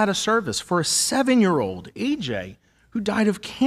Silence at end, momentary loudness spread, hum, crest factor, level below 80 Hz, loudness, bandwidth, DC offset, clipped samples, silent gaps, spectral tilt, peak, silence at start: 0 s; 11 LU; none; 16 dB; -56 dBFS; -22 LUFS; 15 kHz; under 0.1%; under 0.1%; none; -3.5 dB/octave; -6 dBFS; 0 s